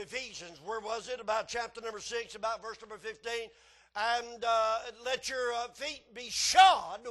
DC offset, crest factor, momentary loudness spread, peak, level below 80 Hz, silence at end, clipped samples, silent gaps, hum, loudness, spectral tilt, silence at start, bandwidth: under 0.1%; 22 dB; 19 LU; -10 dBFS; -66 dBFS; 0 s; under 0.1%; none; none; -31 LUFS; 0 dB/octave; 0 s; 12.5 kHz